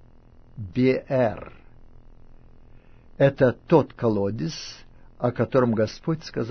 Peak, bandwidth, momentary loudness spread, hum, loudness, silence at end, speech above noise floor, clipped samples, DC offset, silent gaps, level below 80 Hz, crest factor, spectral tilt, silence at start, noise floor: -4 dBFS; 6.6 kHz; 15 LU; none; -23 LUFS; 0 s; 27 dB; under 0.1%; under 0.1%; none; -50 dBFS; 20 dB; -7.5 dB/octave; 0.55 s; -50 dBFS